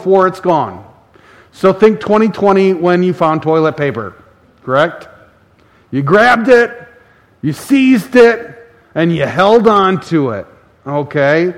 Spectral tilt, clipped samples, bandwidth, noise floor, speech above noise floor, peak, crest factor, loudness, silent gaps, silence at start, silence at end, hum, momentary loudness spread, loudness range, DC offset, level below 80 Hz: -7 dB/octave; 0.4%; 15 kHz; -48 dBFS; 38 dB; 0 dBFS; 12 dB; -12 LUFS; none; 0 s; 0 s; none; 14 LU; 3 LU; under 0.1%; -50 dBFS